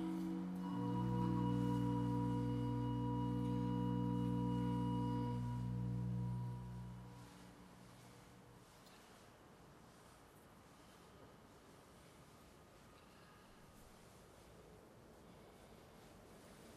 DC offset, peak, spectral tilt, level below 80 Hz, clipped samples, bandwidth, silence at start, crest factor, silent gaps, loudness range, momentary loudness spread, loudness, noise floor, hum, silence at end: under 0.1%; -28 dBFS; -8.5 dB/octave; -60 dBFS; under 0.1%; 13 kHz; 0 s; 16 dB; none; 22 LU; 23 LU; -41 LUFS; -63 dBFS; none; 0 s